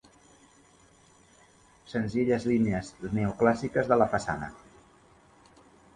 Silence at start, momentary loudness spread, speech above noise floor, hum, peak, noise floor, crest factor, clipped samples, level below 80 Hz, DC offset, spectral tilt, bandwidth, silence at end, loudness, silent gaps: 1.9 s; 10 LU; 32 dB; none; -8 dBFS; -59 dBFS; 22 dB; under 0.1%; -56 dBFS; under 0.1%; -7 dB/octave; 11 kHz; 1.4 s; -28 LUFS; none